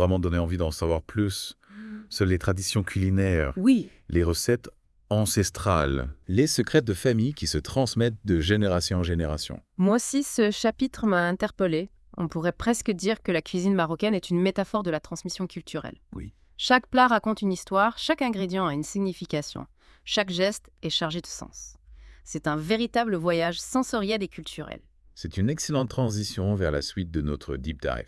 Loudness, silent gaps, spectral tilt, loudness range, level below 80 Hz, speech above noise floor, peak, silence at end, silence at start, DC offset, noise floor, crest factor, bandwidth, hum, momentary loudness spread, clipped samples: -26 LUFS; none; -5 dB/octave; 4 LU; -44 dBFS; 24 dB; -6 dBFS; 0.05 s; 0 s; under 0.1%; -49 dBFS; 20 dB; 12 kHz; none; 13 LU; under 0.1%